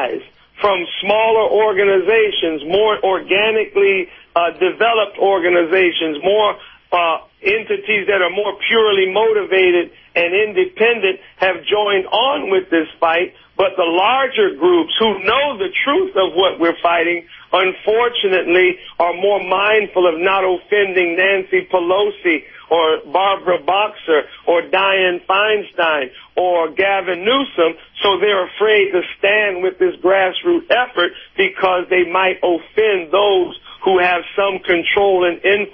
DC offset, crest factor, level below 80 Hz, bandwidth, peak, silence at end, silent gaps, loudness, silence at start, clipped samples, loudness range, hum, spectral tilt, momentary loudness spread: under 0.1%; 16 dB; -56 dBFS; 5.4 kHz; 0 dBFS; 0.05 s; none; -15 LUFS; 0 s; under 0.1%; 1 LU; none; -7 dB/octave; 5 LU